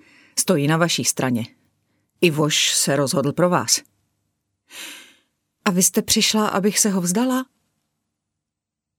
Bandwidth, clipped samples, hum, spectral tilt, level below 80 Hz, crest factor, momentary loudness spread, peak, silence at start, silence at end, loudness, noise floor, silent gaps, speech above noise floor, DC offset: over 20 kHz; under 0.1%; none; -3.5 dB/octave; -60 dBFS; 20 dB; 11 LU; -2 dBFS; 0.35 s; 1.55 s; -19 LUFS; -84 dBFS; none; 65 dB; under 0.1%